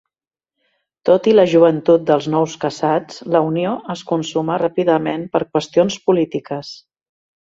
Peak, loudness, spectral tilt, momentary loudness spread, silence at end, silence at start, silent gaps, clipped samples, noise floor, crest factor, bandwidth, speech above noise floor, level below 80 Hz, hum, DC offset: 0 dBFS; -17 LUFS; -6 dB/octave; 10 LU; 0.65 s; 1.05 s; none; under 0.1%; -89 dBFS; 16 dB; 7.8 kHz; 72 dB; -62 dBFS; none; under 0.1%